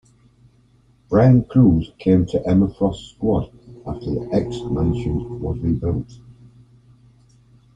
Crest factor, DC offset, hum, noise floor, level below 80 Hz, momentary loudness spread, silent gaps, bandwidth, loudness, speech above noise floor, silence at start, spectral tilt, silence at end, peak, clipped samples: 18 dB; under 0.1%; none; -55 dBFS; -38 dBFS; 14 LU; none; 7.8 kHz; -19 LUFS; 37 dB; 1.1 s; -9.5 dB/octave; 1.45 s; -2 dBFS; under 0.1%